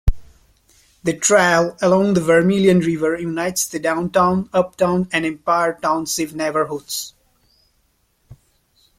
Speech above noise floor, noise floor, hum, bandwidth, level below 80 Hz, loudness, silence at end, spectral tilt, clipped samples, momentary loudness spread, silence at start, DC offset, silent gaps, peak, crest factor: 46 dB; -63 dBFS; none; 16 kHz; -34 dBFS; -18 LUFS; 1.9 s; -4.5 dB/octave; under 0.1%; 10 LU; 0.05 s; under 0.1%; none; -2 dBFS; 18 dB